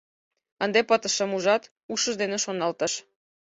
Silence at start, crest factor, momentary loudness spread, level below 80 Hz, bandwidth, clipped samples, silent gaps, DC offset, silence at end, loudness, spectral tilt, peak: 0.6 s; 18 dB; 7 LU; -72 dBFS; 8.2 kHz; under 0.1%; 1.71-1.76 s, 1.83-1.89 s; under 0.1%; 0.45 s; -25 LUFS; -2 dB/octave; -8 dBFS